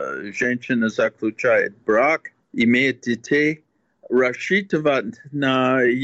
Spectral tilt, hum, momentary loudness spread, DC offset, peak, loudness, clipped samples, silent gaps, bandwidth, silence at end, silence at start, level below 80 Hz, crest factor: -5.5 dB/octave; none; 7 LU; under 0.1%; -8 dBFS; -20 LUFS; under 0.1%; none; 8 kHz; 0 s; 0 s; -64 dBFS; 12 dB